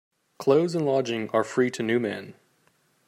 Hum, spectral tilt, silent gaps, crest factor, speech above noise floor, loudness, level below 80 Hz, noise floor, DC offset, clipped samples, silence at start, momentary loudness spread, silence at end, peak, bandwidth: none; -6 dB/octave; none; 18 dB; 42 dB; -25 LUFS; -74 dBFS; -66 dBFS; under 0.1%; under 0.1%; 0.4 s; 7 LU; 0.75 s; -8 dBFS; 15 kHz